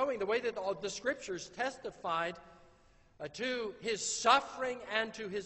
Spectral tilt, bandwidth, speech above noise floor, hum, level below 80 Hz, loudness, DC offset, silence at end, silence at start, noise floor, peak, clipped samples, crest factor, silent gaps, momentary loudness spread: -2 dB/octave; 8.2 kHz; 29 dB; none; -68 dBFS; -35 LUFS; under 0.1%; 0 s; 0 s; -64 dBFS; -12 dBFS; under 0.1%; 24 dB; none; 12 LU